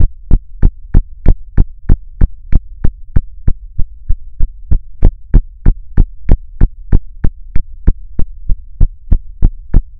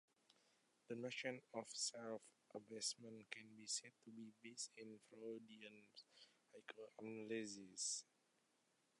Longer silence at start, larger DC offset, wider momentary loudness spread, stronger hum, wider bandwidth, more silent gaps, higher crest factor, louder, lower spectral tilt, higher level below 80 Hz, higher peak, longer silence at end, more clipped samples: second, 0 s vs 0.3 s; neither; second, 9 LU vs 15 LU; neither; second, 2.2 kHz vs 11 kHz; neither; second, 10 dB vs 22 dB; first, -19 LUFS vs -51 LUFS; first, -11.5 dB/octave vs -2 dB/octave; first, -12 dBFS vs under -90 dBFS; first, 0 dBFS vs -32 dBFS; second, 0.2 s vs 0.95 s; first, 6% vs under 0.1%